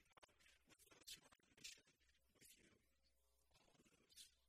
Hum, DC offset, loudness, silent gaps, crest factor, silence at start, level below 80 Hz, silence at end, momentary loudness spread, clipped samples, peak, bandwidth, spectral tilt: none; under 0.1%; -63 LUFS; none; 26 dB; 0 s; -88 dBFS; 0 s; 9 LU; under 0.1%; -42 dBFS; 15.5 kHz; -0.5 dB/octave